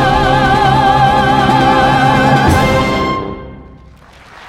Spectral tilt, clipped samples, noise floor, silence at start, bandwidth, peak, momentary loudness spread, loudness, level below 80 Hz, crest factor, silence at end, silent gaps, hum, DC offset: -6 dB/octave; under 0.1%; -39 dBFS; 0 s; 16 kHz; 0 dBFS; 7 LU; -10 LUFS; -28 dBFS; 12 dB; 0 s; none; none; under 0.1%